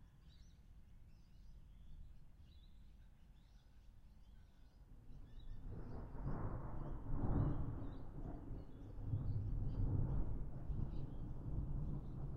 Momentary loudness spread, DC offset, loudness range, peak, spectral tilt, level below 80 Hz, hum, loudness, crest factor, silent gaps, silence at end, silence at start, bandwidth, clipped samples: 24 LU; under 0.1%; 20 LU; -26 dBFS; -10 dB/octave; -48 dBFS; none; -47 LUFS; 18 dB; none; 0 s; 0 s; 4.9 kHz; under 0.1%